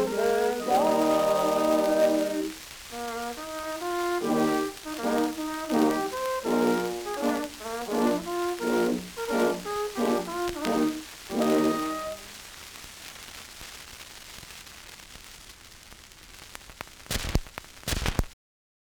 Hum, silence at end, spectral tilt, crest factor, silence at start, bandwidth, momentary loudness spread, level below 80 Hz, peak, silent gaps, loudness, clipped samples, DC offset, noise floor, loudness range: none; 0.55 s; -4.5 dB/octave; 24 dB; 0 s; over 20 kHz; 20 LU; -44 dBFS; -4 dBFS; none; -27 LUFS; under 0.1%; under 0.1%; -49 dBFS; 16 LU